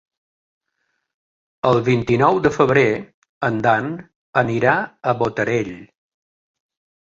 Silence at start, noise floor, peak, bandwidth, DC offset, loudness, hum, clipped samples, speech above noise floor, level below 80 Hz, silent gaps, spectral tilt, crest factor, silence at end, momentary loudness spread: 1.65 s; -73 dBFS; -2 dBFS; 7.8 kHz; under 0.1%; -18 LUFS; none; under 0.1%; 55 dB; -52 dBFS; 3.14-3.22 s, 3.29-3.41 s, 4.16-4.33 s; -7 dB/octave; 20 dB; 1.25 s; 9 LU